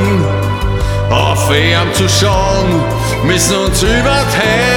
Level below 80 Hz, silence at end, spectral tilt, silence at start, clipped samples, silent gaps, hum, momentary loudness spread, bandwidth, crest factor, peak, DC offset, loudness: -22 dBFS; 0 s; -4.5 dB/octave; 0 s; under 0.1%; none; none; 5 LU; 17.5 kHz; 12 dB; 0 dBFS; under 0.1%; -12 LUFS